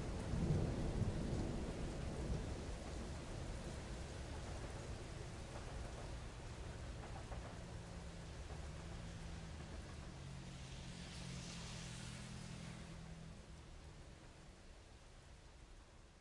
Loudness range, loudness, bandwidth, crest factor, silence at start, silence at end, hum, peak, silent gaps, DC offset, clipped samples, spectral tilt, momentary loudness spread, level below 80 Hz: 9 LU; -49 LUFS; 11.5 kHz; 20 dB; 0 s; 0 s; none; -26 dBFS; none; under 0.1%; under 0.1%; -5.5 dB/octave; 18 LU; -52 dBFS